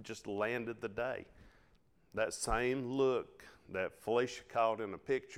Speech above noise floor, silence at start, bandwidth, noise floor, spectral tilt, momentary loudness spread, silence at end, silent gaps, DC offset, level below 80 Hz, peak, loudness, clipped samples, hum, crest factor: 34 dB; 0 s; 15 kHz; -70 dBFS; -4.5 dB/octave; 9 LU; 0 s; none; under 0.1%; -56 dBFS; -18 dBFS; -37 LUFS; under 0.1%; none; 20 dB